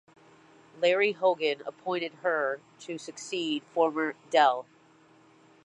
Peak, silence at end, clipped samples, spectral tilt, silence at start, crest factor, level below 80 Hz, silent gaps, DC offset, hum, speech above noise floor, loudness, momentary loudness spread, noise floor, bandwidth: -10 dBFS; 1 s; under 0.1%; -3.5 dB/octave; 0.75 s; 20 dB; -86 dBFS; none; under 0.1%; none; 31 dB; -28 LUFS; 15 LU; -59 dBFS; 10.5 kHz